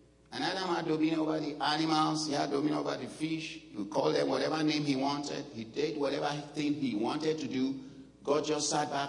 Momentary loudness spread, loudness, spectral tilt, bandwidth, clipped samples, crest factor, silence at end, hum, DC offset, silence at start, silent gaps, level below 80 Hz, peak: 9 LU; -32 LUFS; -4.5 dB/octave; 11 kHz; under 0.1%; 18 dB; 0 s; none; under 0.1%; 0.3 s; none; -70 dBFS; -16 dBFS